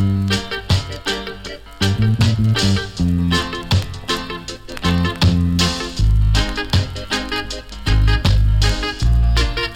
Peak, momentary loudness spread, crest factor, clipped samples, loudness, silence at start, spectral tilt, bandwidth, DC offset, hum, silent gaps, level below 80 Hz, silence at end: -2 dBFS; 8 LU; 16 dB; under 0.1%; -18 LUFS; 0 s; -5 dB/octave; 16 kHz; under 0.1%; none; none; -22 dBFS; 0 s